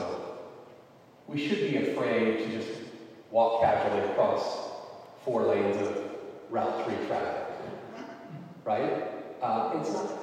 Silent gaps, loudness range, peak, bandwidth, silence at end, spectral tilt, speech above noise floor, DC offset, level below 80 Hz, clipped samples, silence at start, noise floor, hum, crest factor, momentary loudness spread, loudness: none; 5 LU; -12 dBFS; 13.5 kHz; 0 s; -6 dB/octave; 27 dB; under 0.1%; -70 dBFS; under 0.1%; 0 s; -55 dBFS; none; 18 dB; 17 LU; -30 LUFS